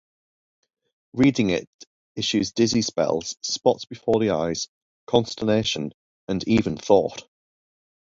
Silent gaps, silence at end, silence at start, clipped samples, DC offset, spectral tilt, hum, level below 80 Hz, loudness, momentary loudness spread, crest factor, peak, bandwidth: 1.67-1.79 s, 1.87-2.15 s, 4.68-5.07 s, 5.94-6.27 s; 0.9 s; 1.15 s; under 0.1%; under 0.1%; -5 dB/octave; none; -54 dBFS; -23 LUFS; 11 LU; 22 dB; -2 dBFS; 7.8 kHz